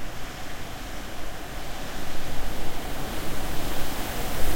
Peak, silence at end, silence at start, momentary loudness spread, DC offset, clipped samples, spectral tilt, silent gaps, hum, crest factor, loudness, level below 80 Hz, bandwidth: -6 dBFS; 0 s; 0 s; 6 LU; under 0.1%; under 0.1%; -4 dB/octave; none; none; 14 dB; -34 LUFS; -34 dBFS; 16.5 kHz